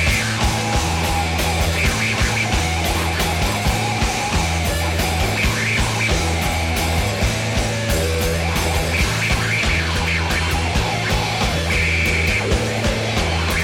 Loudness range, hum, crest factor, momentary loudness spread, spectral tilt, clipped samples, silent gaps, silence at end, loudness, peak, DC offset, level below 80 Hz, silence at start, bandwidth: 1 LU; none; 12 dB; 2 LU; -4 dB/octave; under 0.1%; none; 0 s; -19 LUFS; -8 dBFS; under 0.1%; -26 dBFS; 0 s; 17 kHz